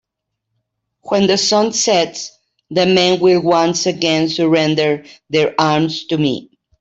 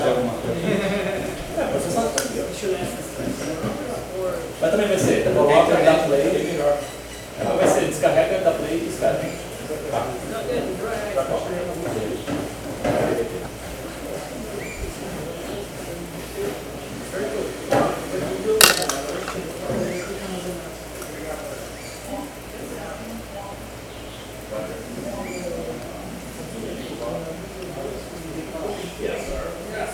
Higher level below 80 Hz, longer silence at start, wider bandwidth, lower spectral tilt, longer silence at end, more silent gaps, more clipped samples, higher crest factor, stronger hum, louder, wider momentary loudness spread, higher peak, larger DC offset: second, -58 dBFS vs -44 dBFS; first, 1.05 s vs 0 s; second, 8.2 kHz vs 16 kHz; about the same, -4 dB/octave vs -4 dB/octave; first, 0.4 s vs 0 s; neither; neither; second, 14 dB vs 24 dB; neither; first, -15 LUFS vs -24 LUFS; second, 9 LU vs 14 LU; about the same, -2 dBFS vs 0 dBFS; neither